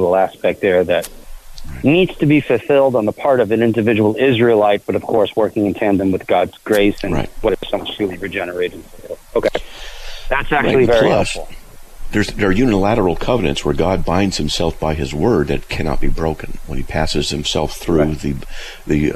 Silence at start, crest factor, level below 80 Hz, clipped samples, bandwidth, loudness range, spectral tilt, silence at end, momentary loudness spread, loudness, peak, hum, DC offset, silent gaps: 0 s; 12 dB; -28 dBFS; under 0.1%; 14.5 kHz; 5 LU; -6 dB/octave; 0 s; 11 LU; -16 LUFS; -4 dBFS; none; under 0.1%; none